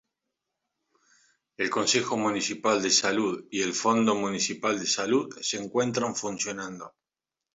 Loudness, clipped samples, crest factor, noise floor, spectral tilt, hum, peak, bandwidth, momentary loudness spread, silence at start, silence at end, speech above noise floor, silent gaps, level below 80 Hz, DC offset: -26 LUFS; under 0.1%; 18 dB; -90 dBFS; -2.5 dB/octave; none; -10 dBFS; 8 kHz; 9 LU; 1.6 s; 0.7 s; 62 dB; none; -70 dBFS; under 0.1%